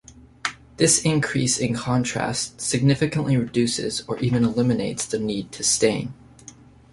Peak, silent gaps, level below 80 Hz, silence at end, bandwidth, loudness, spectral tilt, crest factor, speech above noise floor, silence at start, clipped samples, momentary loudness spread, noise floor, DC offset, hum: -4 dBFS; none; -52 dBFS; 0.8 s; 11.5 kHz; -22 LUFS; -4 dB/octave; 20 dB; 25 dB; 0.1 s; under 0.1%; 10 LU; -47 dBFS; under 0.1%; none